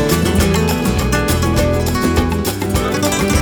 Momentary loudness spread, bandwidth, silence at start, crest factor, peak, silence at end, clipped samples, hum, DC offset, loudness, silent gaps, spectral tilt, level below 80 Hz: 4 LU; over 20 kHz; 0 s; 12 dB; -2 dBFS; 0 s; under 0.1%; none; under 0.1%; -16 LUFS; none; -5 dB/octave; -24 dBFS